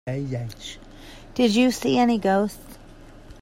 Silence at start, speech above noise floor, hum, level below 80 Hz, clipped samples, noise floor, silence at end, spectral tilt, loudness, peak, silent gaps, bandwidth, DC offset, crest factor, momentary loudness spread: 0.05 s; 23 dB; none; -48 dBFS; under 0.1%; -45 dBFS; 0.1 s; -5.5 dB/octave; -22 LUFS; -8 dBFS; none; 16 kHz; under 0.1%; 16 dB; 23 LU